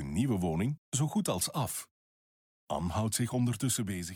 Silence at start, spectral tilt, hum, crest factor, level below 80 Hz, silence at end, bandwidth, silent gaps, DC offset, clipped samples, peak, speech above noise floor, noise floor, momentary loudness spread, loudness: 0 s; -5 dB/octave; none; 14 dB; -54 dBFS; 0 s; 19.5 kHz; 0.78-0.92 s, 1.91-2.67 s; under 0.1%; under 0.1%; -18 dBFS; over 58 dB; under -90 dBFS; 6 LU; -32 LUFS